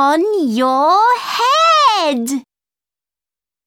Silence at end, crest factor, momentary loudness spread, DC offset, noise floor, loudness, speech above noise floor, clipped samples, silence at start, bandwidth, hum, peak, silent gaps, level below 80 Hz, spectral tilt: 1.25 s; 12 dB; 9 LU; under 0.1%; under -90 dBFS; -13 LUFS; over 76 dB; under 0.1%; 0 s; 17.5 kHz; none; -2 dBFS; none; -68 dBFS; -2.5 dB/octave